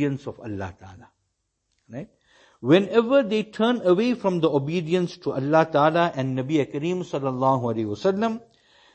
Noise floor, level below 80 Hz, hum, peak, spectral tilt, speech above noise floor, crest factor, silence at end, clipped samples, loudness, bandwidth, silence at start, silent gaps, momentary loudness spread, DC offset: -75 dBFS; -64 dBFS; none; -4 dBFS; -7 dB/octave; 53 dB; 18 dB; 0.55 s; under 0.1%; -23 LUFS; 8.6 kHz; 0 s; none; 14 LU; under 0.1%